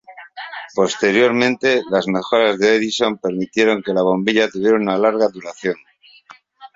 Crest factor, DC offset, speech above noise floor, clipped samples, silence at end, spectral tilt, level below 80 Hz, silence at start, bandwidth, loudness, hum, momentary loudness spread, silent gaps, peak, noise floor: 16 dB; under 0.1%; 30 dB; under 0.1%; 0.1 s; -4.5 dB/octave; -60 dBFS; 0.1 s; 7.8 kHz; -17 LUFS; none; 11 LU; none; -2 dBFS; -47 dBFS